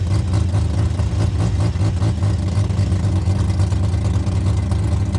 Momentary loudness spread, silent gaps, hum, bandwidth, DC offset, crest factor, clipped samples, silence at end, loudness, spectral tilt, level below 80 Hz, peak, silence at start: 1 LU; none; none; 10.5 kHz; under 0.1%; 12 dB; under 0.1%; 0 s; -19 LUFS; -7.5 dB/octave; -26 dBFS; -6 dBFS; 0 s